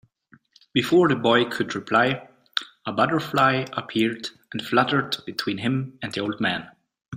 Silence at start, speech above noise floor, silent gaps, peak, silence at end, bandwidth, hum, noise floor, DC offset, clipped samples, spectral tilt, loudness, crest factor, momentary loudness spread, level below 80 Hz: 0.75 s; 35 dB; 7.08-7.12 s; -2 dBFS; 0 s; 16 kHz; none; -58 dBFS; under 0.1%; under 0.1%; -5.5 dB/octave; -23 LUFS; 22 dB; 11 LU; -64 dBFS